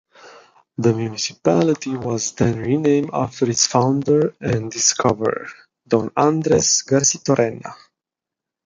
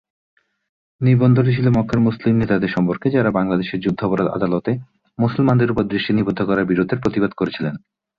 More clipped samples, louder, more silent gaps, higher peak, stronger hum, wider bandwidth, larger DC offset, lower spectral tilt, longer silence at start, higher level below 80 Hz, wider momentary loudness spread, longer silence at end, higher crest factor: neither; about the same, -18 LUFS vs -18 LUFS; neither; first, 0 dBFS vs -4 dBFS; neither; first, 10.5 kHz vs 6.4 kHz; neither; second, -4 dB/octave vs -9.5 dB/octave; second, 0.25 s vs 1 s; about the same, -52 dBFS vs -48 dBFS; about the same, 8 LU vs 7 LU; first, 0.95 s vs 0.4 s; about the same, 18 dB vs 16 dB